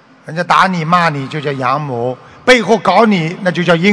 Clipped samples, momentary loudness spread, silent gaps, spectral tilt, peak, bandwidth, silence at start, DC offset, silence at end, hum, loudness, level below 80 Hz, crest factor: 0.9%; 10 LU; none; -5.5 dB/octave; 0 dBFS; 11 kHz; 0.25 s; under 0.1%; 0 s; none; -13 LUFS; -48 dBFS; 12 dB